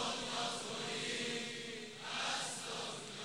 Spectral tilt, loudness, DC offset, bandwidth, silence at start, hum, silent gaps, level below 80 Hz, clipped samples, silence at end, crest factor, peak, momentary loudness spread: -1.5 dB/octave; -40 LUFS; under 0.1%; 16 kHz; 0 s; none; none; -74 dBFS; under 0.1%; 0 s; 16 dB; -26 dBFS; 6 LU